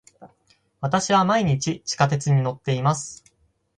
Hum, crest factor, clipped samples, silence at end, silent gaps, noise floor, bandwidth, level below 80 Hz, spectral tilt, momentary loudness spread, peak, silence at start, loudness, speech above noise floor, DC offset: none; 20 dB; under 0.1%; 0.6 s; none; -65 dBFS; 10.5 kHz; -56 dBFS; -5 dB/octave; 9 LU; -4 dBFS; 0.2 s; -22 LUFS; 44 dB; under 0.1%